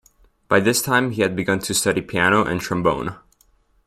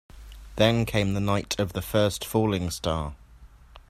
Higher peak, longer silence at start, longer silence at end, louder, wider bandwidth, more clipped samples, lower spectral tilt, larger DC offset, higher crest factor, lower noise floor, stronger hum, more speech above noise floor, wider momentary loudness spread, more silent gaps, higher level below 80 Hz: about the same, -2 dBFS vs -4 dBFS; first, 0.5 s vs 0.15 s; first, 0.7 s vs 0.1 s; first, -19 LUFS vs -26 LUFS; about the same, 16 kHz vs 15.5 kHz; neither; second, -4 dB/octave vs -5.5 dB/octave; neither; about the same, 18 dB vs 22 dB; first, -59 dBFS vs -50 dBFS; neither; first, 40 dB vs 25 dB; about the same, 5 LU vs 7 LU; neither; second, -50 dBFS vs -44 dBFS